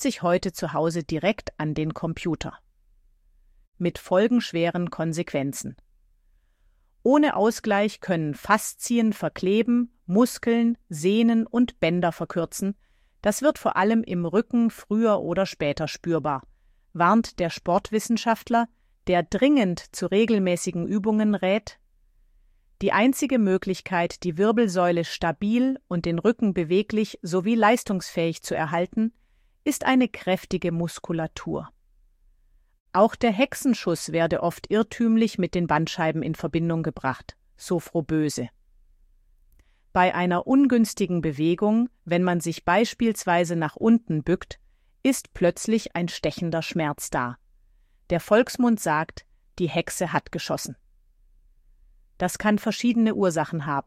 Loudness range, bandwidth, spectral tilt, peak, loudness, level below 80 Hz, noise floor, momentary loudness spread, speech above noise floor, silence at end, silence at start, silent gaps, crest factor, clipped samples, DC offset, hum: 5 LU; 15.5 kHz; -5.5 dB/octave; -4 dBFS; -24 LUFS; -54 dBFS; -62 dBFS; 9 LU; 39 dB; 0.05 s; 0 s; 3.67-3.72 s, 32.80-32.86 s; 20 dB; under 0.1%; under 0.1%; none